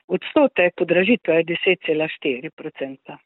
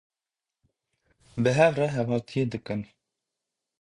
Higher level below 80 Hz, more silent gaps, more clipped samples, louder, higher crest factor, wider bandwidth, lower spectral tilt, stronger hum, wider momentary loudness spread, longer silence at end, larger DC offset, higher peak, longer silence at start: about the same, -66 dBFS vs -62 dBFS; first, 2.53-2.57 s vs none; neither; first, -19 LUFS vs -26 LUFS; second, 16 dB vs 22 dB; second, 4.1 kHz vs 11 kHz; first, -10 dB/octave vs -6.5 dB/octave; neither; about the same, 14 LU vs 15 LU; second, 0.1 s vs 0.95 s; neither; first, -4 dBFS vs -8 dBFS; second, 0.1 s vs 1.35 s